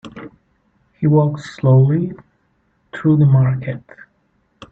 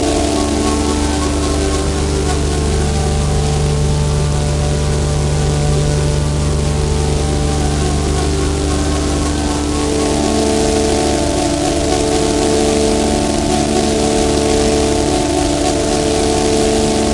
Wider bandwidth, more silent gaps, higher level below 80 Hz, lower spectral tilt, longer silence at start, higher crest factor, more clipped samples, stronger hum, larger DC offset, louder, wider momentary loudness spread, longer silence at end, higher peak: second, 7.4 kHz vs 11.5 kHz; neither; second, -54 dBFS vs -22 dBFS; first, -10 dB/octave vs -5 dB/octave; about the same, 0.05 s vs 0 s; about the same, 16 dB vs 12 dB; neither; neither; neither; about the same, -16 LUFS vs -15 LUFS; first, 20 LU vs 3 LU; first, 0.9 s vs 0 s; about the same, -2 dBFS vs -2 dBFS